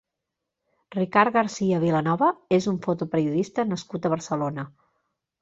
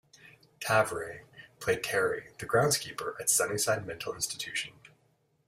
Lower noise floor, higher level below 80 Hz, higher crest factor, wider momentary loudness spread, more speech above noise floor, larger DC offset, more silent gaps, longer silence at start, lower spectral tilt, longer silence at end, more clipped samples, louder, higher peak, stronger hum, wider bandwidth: first, -84 dBFS vs -71 dBFS; about the same, -64 dBFS vs -64 dBFS; about the same, 22 dB vs 22 dB; second, 9 LU vs 12 LU; first, 60 dB vs 40 dB; neither; neither; first, 0.9 s vs 0.25 s; first, -6.5 dB/octave vs -2.5 dB/octave; about the same, 0.7 s vs 0.6 s; neither; first, -24 LUFS vs -30 LUFS; first, -4 dBFS vs -10 dBFS; neither; second, 7.8 kHz vs 16 kHz